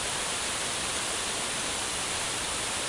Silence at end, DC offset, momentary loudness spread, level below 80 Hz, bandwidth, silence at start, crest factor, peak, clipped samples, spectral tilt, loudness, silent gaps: 0 s; under 0.1%; 0 LU; -52 dBFS; 12 kHz; 0 s; 14 dB; -16 dBFS; under 0.1%; -0.5 dB/octave; -29 LUFS; none